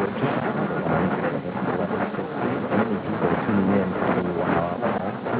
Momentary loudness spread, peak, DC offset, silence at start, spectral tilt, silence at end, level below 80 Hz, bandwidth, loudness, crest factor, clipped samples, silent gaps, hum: 5 LU; -10 dBFS; under 0.1%; 0 s; -11.5 dB/octave; 0 s; -50 dBFS; 4 kHz; -24 LUFS; 14 dB; under 0.1%; none; none